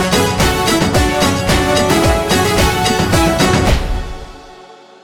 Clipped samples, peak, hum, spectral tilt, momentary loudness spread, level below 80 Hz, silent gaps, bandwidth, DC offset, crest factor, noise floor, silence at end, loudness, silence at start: under 0.1%; 0 dBFS; none; -4.5 dB/octave; 6 LU; -24 dBFS; none; over 20 kHz; 0.6%; 14 dB; -39 dBFS; 0.3 s; -13 LUFS; 0 s